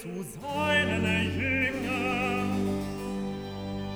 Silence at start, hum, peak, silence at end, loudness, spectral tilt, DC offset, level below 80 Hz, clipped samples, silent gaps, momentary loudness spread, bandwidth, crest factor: 0 s; none; -12 dBFS; 0 s; -29 LUFS; -5.5 dB/octave; under 0.1%; -50 dBFS; under 0.1%; none; 11 LU; over 20 kHz; 18 dB